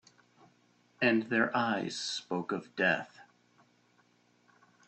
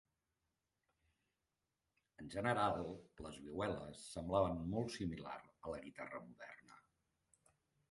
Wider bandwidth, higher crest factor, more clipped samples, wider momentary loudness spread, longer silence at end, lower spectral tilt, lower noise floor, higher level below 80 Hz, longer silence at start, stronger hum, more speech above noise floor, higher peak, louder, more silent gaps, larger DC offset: second, 8.8 kHz vs 11.5 kHz; about the same, 22 dB vs 24 dB; neither; second, 7 LU vs 17 LU; first, 1.65 s vs 1.1 s; second, -4 dB/octave vs -6 dB/octave; second, -69 dBFS vs -90 dBFS; second, -78 dBFS vs -64 dBFS; second, 1 s vs 2.2 s; first, 60 Hz at -55 dBFS vs none; second, 37 dB vs 47 dB; first, -14 dBFS vs -22 dBFS; first, -31 LUFS vs -43 LUFS; neither; neither